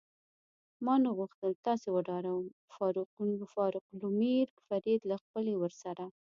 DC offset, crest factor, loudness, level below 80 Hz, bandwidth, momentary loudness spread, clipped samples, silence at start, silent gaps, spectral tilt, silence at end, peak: under 0.1%; 14 dB; -34 LUFS; -82 dBFS; 7.4 kHz; 9 LU; under 0.1%; 0.8 s; 1.34-1.42 s, 1.55-1.63 s, 2.52-2.68 s, 3.06-3.17 s, 3.81-3.89 s, 4.50-4.57 s, 5.21-5.34 s; -7.5 dB/octave; 0.2 s; -20 dBFS